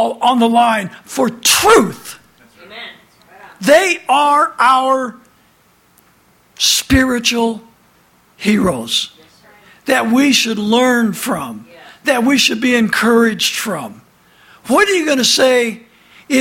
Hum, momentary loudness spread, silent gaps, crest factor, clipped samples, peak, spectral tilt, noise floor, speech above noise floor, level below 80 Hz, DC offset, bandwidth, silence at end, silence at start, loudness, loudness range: none; 16 LU; none; 16 dB; under 0.1%; 0 dBFS; -3 dB/octave; -53 dBFS; 40 dB; -42 dBFS; under 0.1%; 17 kHz; 0 s; 0 s; -13 LUFS; 3 LU